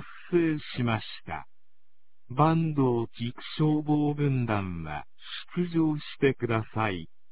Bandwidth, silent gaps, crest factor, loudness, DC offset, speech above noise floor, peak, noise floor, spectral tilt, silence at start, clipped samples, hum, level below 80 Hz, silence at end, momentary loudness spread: 4 kHz; none; 20 dB; -28 LUFS; 0.7%; 56 dB; -8 dBFS; -83 dBFS; -11 dB/octave; 0 s; under 0.1%; none; -54 dBFS; 0.25 s; 13 LU